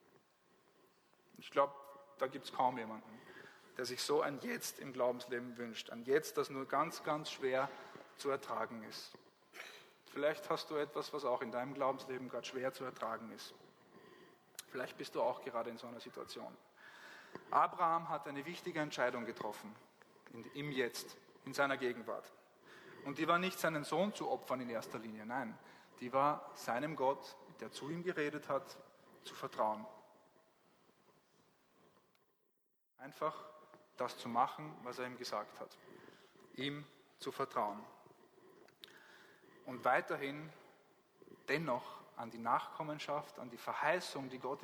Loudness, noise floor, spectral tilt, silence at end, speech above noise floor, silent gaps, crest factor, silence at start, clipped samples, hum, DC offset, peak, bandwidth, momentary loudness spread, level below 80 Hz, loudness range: -40 LUFS; -81 dBFS; -4 dB/octave; 0 s; 41 dB; none; 24 dB; 1.4 s; under 0.1%; none; under 0.1%; -18 dBFS; over 20 kHz; 20 LU; -90 dBFS; 7 LU